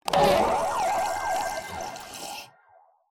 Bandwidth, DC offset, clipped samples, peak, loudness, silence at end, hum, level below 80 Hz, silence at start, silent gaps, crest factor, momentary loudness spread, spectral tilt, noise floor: 17 kHz; under 0.1%; under 0.1%; -6 dBFS; -26 LUFS; 0.65 s; none; -52 dBFS; 0.05 s; none; 20 dB; 16 LU; -3.5 dB/octave; -59 dBFS